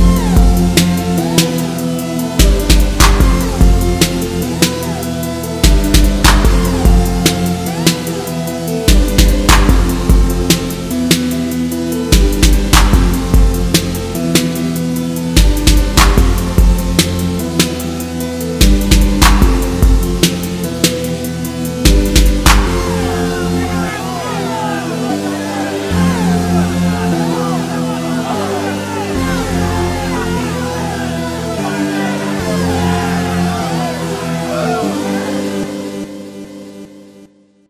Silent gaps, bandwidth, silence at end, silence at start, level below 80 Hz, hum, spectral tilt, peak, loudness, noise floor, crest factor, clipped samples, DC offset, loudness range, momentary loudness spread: none; 16 kHz; 0.45 s; 0 s; -16 dBFS; none; -4.5 dB/octave; 0 dBFS; -14 LUFS; -44 dBFS; 12 dB; 0.3%; under 0.1%; 4 LU; 9 LU